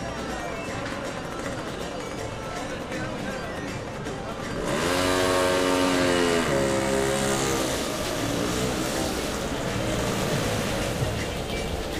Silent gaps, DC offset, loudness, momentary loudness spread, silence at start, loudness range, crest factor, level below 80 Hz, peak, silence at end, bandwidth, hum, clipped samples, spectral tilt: none; under 0.1%; -26 LUFS; 10 LU; 0 s; 9 LU; 16 dB; -42 dBFS; -10 dBFS; 0 s; 15.5 kHz; none; under 0.1%; -4 dB/octave